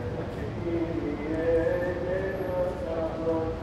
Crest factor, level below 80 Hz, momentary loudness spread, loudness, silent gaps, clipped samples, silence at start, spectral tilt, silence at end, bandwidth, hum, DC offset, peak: 14 dB; -44 dBFS; 7 LU; -29 LUFS; none; under 0.1%; 0 s; -8 dB/octave; 0 s; 12 kHz; none; under 0.1%; -14 dBFS